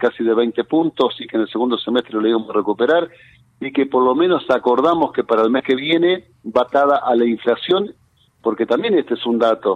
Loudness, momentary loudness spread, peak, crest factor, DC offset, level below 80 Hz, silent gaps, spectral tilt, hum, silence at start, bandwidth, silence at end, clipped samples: -17 LUFS; 6 LU; -4 dBFS; 14 dB; under 0.1%; -62 dBFS; none; -6.5 dB/octave; none; 0 s; 6.6 kHz; 0 s; under 0.1%